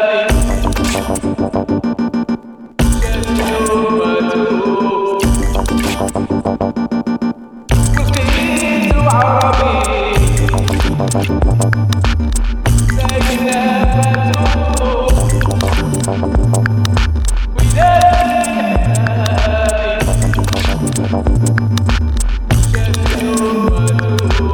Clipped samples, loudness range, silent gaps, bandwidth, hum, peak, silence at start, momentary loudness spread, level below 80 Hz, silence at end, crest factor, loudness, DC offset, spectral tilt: under 0.1%; 3 LU; none; 18.5 kHz; none; 0 dBFS; 0 s; 5 LU; -18 dBFS; 0 s; 12 dB; -14 LUFS; under 0.1%; -5.5 dB/octave